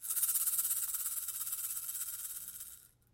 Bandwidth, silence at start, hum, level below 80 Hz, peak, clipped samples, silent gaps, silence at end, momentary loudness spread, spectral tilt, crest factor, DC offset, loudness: 17 kHz; 0 s; none; -74 dBFS; -18 dBFS; under 0.1%; none; 0.25 s; 13 LU; 3 dB/octave; 20 dB; under 0.1%; -34 LUFS